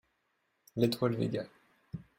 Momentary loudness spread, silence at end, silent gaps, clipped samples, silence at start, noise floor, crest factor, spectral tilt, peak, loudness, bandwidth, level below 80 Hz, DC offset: 18 LU; 0.2 s; none; under 0.1%; 0.75 s; -78 dBFS; 22 dB; -7 dB/octave; -14 dBFS; -33 LUFS; 16 kHz; -66 dBFS; under 0.1%